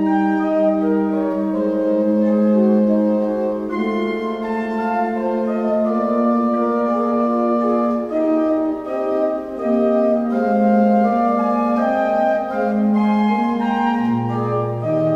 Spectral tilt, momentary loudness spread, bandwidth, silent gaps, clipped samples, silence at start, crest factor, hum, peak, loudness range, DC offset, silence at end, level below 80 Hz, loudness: -9 dB/octave; 6 LU; 6.2 kHz; none; under 0.1%; 0 s; 12 dB; none; -6 dBFS; 2 LU; under 0.1%; 0 s; -54 dBFS; -18 LUFS